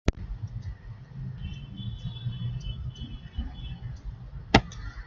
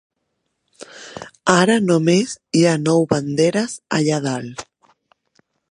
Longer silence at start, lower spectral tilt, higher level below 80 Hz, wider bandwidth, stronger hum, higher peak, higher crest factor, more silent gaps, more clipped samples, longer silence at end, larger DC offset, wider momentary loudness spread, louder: second, 0.05 s vs 0.8 s; about the same, -6 dB/octave vs -5 dB/octave; first, -38 dBFS vs -60 dBFS; second, 7.6 kHz vs 11.5 kHz; neither; about the same, -2 dBFS vs 0 dBFS; first, 30 dB vs 20 dB; neither; neither; second, 0 s vs 1.1 s; neither; about the same, 18 LU vs 20 LU; second, -33 LUFS vs -18 LUFS